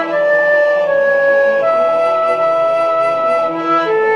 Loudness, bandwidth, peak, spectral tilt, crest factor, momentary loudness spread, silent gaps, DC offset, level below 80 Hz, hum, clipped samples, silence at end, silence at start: -13 LUFS; 10 kHz; -4 dBFS; -5 dB/octave; 10 dB; 3 LU; none; under 0.1%; -68 dBFS; none; under 0.1%; 0 s; 0 s